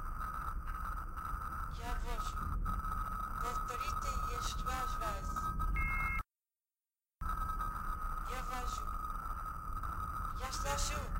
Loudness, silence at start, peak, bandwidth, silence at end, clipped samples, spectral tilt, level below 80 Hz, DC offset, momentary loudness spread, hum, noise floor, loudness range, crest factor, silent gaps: -40 LUFS; 0 s; -22 dBFS; 16 kHz; 0 s; under 0.1%; -4 dB/octave; -42 dBFS; under 0.1%; 6 LU; none; under -90 dBFS; 3 LU; 18 dB; none